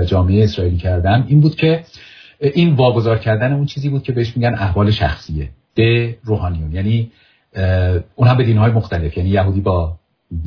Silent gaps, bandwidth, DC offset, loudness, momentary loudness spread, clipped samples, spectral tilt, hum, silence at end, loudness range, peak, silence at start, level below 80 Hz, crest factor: none; 5.4 kHz; under 0.1%; -16 LUFS; 9 LU; under 0.1%; -9 dB/octave; none; 0 s; 3 LU; -2 dBFS; 0 s; -32 dBFS; 14 dB